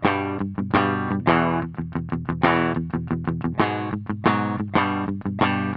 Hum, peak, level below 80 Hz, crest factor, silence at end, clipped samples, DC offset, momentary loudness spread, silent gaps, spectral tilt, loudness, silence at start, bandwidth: none; -4 dBFS; -50 dBFS; 18 dB; 0 s; under 0.1%; under 0.1%; 8 LU; none; -10.5 dB/octave; -23 LUFS; 0 s; 5.4 kHz